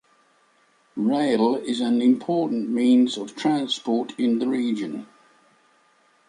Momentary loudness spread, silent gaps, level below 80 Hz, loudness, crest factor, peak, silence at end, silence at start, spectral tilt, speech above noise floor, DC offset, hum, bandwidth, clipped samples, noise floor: 8 LU; none; -74 dBFS; -22 LUFS; 16 dB; -8 dBFS; 1.25 s; 0.95 s; -5.5 dB/octave; 40 dB; under 0.1%; none; 10.5 kHz; under 0.1%; -62 dBFS